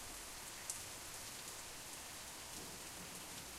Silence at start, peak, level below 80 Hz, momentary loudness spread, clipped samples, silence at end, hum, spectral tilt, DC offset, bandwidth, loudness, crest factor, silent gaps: 0 s; -24 dBFS; -66 dBFS; 3 LU; under 0.1%; 0 s; none; -1 dB/octave; under 0.1%; 16 kHz; -48 LUFS; 26 dB; none